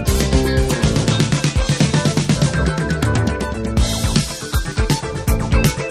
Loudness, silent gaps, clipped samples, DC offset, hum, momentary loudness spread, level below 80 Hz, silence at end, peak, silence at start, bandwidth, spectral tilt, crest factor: -18 LUFS; none; under 0.1%; under 0.1%; none; 4 LU; -24 dBFS; 0 s; 0 dBFS; 0 s; 15.5 kHz; -5 dB/octave; 16 dB